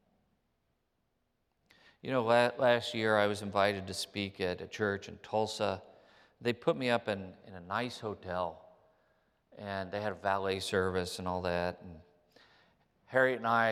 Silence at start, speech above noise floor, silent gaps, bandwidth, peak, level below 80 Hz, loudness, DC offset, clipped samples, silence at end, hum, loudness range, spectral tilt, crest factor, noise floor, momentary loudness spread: 2.05 s; 46 dB; none; 15 kHz; -12 dBFS; -74 dBFS; -33 LUFS; under 0.1%; under 0.1%; 0 s; none; 6 LU; -5 dB/octave; 22 dB; -79 dBFS; 12 LU